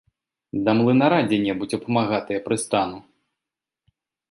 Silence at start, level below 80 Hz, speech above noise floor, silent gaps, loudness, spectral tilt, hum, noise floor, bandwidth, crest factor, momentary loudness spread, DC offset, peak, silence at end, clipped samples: 0.55 s; -60 dBFS; 66 dB; none; -22 LUFS; -5.5 dB/octave; none; -87 dBFS; 11.5 kHz; 20 dB; 10 LU; under 0.1%; -4 dBFS; 1.3 s; under 0.1%